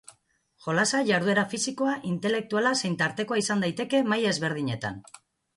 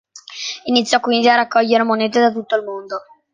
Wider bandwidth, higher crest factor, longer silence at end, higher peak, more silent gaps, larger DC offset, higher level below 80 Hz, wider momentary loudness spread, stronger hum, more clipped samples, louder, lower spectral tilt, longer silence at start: first, 11.5 kHz vs 9.6 kHz; about the same, 16 dB vs 16 dB; first, 0.55 s vs 0.35 s; second, -12 dBFS vs -2 dBFS; neither; neither; about the same, -66 dBFS vs -66 dBFS; second, 7 LU vs 14 LU; neither; neither; second, -26 LUFS vs -16 LUFS; about the same, -4 dB/octave vs -3 dB/octave; first, 0.6 s vs 0.15 s